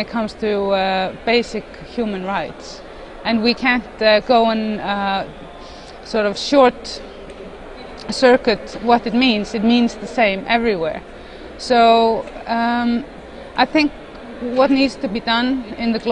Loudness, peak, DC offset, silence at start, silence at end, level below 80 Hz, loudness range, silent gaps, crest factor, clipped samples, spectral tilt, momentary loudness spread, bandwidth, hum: -17 LUFS; 0 dBFS; under 0.1%; 0 s; 0 s; -44 dBFS; 4 LU; none; 18 dB; under 0.1%; -5 dB/octave; 21 LU; 10 kHz; none